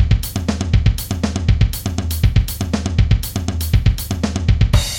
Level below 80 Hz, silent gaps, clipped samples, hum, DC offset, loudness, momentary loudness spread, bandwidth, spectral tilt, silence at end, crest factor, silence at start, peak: -20 dBFS; none; under 0.1%; none; under 0.1%; -18 LUFS; 5 LU; 17 kHz; -5.5 dB/octave; 0 s; 14 dB; 0 s; -2 dBFS